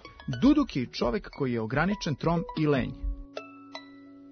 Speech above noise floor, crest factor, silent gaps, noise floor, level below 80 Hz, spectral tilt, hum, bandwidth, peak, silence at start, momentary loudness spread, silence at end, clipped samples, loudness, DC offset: 22 dB; 18 dB; none; -49 dBFS; -44 dBFS; -7 dB/octave; none; 6.6 kHz; -12 dBFS; 0.05 s; 20 LU; 0 s; under 0.1%; -28 LUFS; under 0.1%